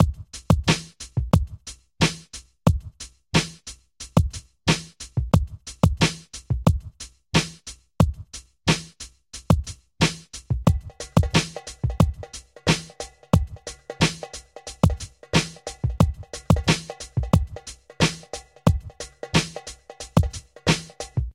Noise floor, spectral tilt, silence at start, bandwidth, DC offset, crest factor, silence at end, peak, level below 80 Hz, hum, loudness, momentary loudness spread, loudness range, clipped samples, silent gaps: -44 dBFS; -5 dB/octave; 0 s; 16.5 kHz; under 0.1%; 22 dB; 0.05 s; -2 dBFS; -34 dBFS; none; -24 LUFS; 16 LU; 2 LU; under 0.1%; none